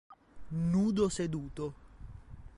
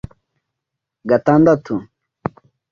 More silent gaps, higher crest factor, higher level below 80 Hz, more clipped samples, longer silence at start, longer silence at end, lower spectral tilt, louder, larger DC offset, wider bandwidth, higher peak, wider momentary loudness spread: neither; about the same, 16 dB vs 18 dB; about the same, -52 dBFS vs -50 dBFS; neither; second, 0.1 s vs 1.05 s; second, 0 s vs 0.9 s; second, -7 dB/octave vs -9 dB/octave; second, -33 LUFS vs -15 LUFS; neither; first, 11.5 kHz vs 7 kHz; second, -18 dBFS vs -2 dBFS; first, 23 LU vs 19 LU